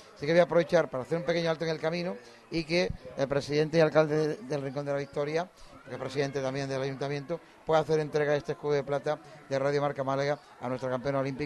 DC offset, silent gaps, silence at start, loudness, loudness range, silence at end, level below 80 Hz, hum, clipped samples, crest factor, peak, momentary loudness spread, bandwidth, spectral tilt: under 0.1%; none; 0 s; -30 LUFS; 3 LU; 0 s; -58 dBFS; none; under 0.1%; 20 dB; -10 dBFS; 11 LU; 12 kHz; -6 dB/octave